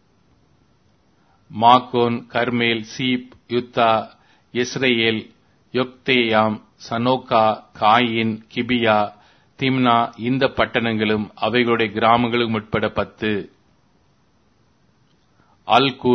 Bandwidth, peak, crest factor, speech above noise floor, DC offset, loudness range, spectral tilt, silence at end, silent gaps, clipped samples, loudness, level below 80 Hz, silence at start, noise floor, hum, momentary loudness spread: 6.4 kHz; 0 dBFS; 20 dB; 41 dB; under 0.1%; 4 LU; -5.5 dB/octave; 0 s; none; under 0.1%; -19 LUFS; -54 dBFS; 1.5 s; -60 dBFS; none; 10 LU